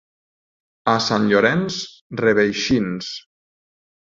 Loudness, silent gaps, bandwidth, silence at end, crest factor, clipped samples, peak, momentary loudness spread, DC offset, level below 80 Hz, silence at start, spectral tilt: -19 LUFS; 2.01-2.10 s; 7.6 kHz; 0.95 s; 20 dB; under 0.1%; -2 dBFS; 13 LU; under 0.1%; -54 dBFS; 0.85 s; -5 dB/octave